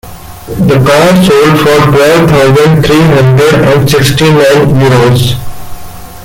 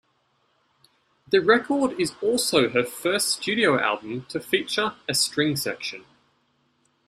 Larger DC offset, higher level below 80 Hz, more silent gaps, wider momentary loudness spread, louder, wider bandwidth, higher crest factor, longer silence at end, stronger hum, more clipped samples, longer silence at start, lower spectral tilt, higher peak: neither; first, -28 dBFS vs -64 dBFS; neither; second, 5 LU vs 10 LU; first, -5 LUFS vs -23 LUFS; about the same, 17 kHz vs 15.5 kHz; second, 6 dB vs 20 dB; second, 0 s vs 1.05 s; neither; first, 0.2% vs under 0.1%; second, 0.05 s vs 1.3 s; first, -6 dB/octave vs -3 dB/octave; first, 0 dBFS vs -6 dBFS